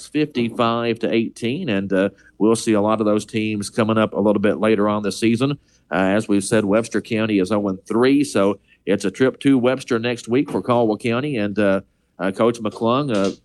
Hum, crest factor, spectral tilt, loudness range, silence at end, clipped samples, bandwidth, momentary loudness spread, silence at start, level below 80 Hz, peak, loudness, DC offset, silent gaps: none; 16 dB; -6 dB/octave; 1 LU; 0.1 s; under 0.1%; 12.5 kHz; 6 LU; 0 s; -58 dBFS; -4 dBFS; -20 LUFS; under 0.1%; none